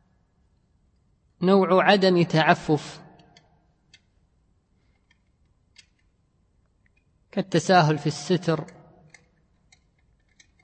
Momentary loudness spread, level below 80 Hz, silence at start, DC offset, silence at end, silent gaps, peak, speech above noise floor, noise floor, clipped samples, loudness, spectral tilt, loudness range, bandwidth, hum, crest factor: 14 LU; -64 dBFS; 1.4 s; under 0.1%; 2 s; none; -4 dBFS; 45 dB; -66 dBFS; under 0.1%; -21 LUFS; -6 dB/octave; 9 LU; 8.8 kHz; none; 22 dB